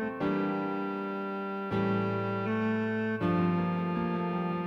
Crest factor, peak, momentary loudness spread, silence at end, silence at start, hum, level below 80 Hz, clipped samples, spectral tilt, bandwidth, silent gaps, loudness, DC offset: 14 dB; -16 dBFS; 6 LU; 0 s; 0 s; none; -64 dBFS; under 0.1%; -9 dB/octave; 5.8 kHz; none; -31 LUFS; under 0.1%